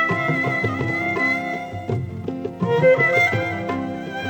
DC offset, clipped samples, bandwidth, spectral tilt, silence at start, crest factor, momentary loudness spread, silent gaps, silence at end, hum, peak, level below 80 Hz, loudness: under 0.1%; under 0.1%; over 20 kHz; -6.5 dB/octave; 0 s; 16 dB; 13 LU; none; 0 s; none; -6 dBFS; -54 dBFS; -21 LUFS